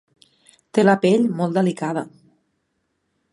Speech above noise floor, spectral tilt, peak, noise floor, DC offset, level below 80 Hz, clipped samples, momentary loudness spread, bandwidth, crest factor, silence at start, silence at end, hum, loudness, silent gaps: 54 dB; -7 dB/octave; -2 dBFS; -72 dBFS; under 0.1%; -70 dBFS; under 0.1%; 11 LU; 11.5 kHz; 20 dB; 0.75 s; 1.25 s; none; -19 LUFS; none